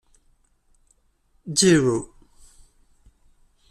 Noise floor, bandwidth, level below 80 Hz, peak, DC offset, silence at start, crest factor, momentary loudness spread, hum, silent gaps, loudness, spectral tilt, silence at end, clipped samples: -64 dBFS; 14 kHz; -54 dBFS; -6 dBFS; under 0.1%; 1.45 s; 20 dB; 26 LU; none; none; -20 LUFS; -4 dB/octave; 1.65 s; under 0.1%